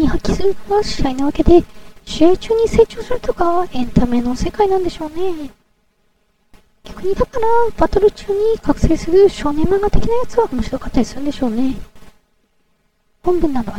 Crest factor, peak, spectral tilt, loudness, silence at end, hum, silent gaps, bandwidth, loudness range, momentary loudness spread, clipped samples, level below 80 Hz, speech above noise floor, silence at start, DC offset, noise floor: 16 dB; 0 dBFS; -6.5 dB/octave; -17 LUFS; 0 s; none; none; 14 kHz; 6 LU; 10 LU; under 0.1%; -26 dBFS; 47 dB; 0 s; under 0.1%; -61 dBFS